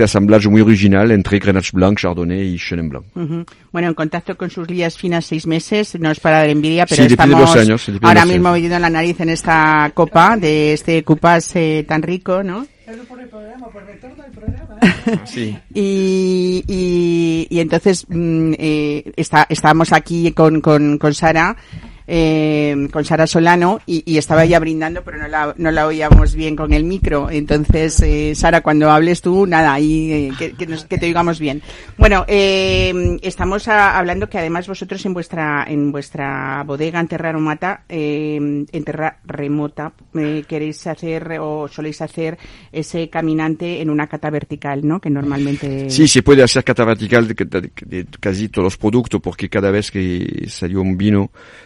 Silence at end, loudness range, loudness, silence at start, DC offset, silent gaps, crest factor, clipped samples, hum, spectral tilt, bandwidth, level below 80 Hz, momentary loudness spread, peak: 0.4 s; 10 LU; -15 LUFS; 0 s; under 0.1%; none; 14 dB; 0.4%; none; -5.5 dB/octave; 11.5 kHz; -26 dBFS; 14 LU; 0 dBFS